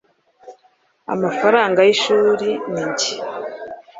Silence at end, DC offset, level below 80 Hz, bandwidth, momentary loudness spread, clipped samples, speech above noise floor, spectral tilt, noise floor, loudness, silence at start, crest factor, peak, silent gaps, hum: 0 s; under 0.1%; -64 dBFS; 7.8 kHz; 16 LU; under 0.1%; 42 dB; -3.5 dB/octave; -59 dBFS; -17 LUFS; 0.45 s; 18 dB; -2 dBFS; none; none